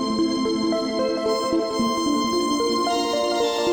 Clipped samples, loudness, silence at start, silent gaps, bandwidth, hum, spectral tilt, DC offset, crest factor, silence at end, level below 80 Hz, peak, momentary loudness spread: under 0.1%; -22 LUFS; 0 s; none; over 20 kHz; none; -3.5 dB/octave; under 0.1%; 12 dB; 0 s; -54 dBFS; -10 dBFS; 2 LU